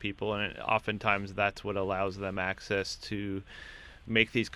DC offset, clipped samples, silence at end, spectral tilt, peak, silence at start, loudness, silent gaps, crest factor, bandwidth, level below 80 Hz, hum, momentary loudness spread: under 0.1%; under 0.1%; 0 s; -5 dB/octave; -8 dBFS; 0 s; -31 LUFS; none; 24 dB; 13.5 kHz; -54 dBFS; none; 13 LU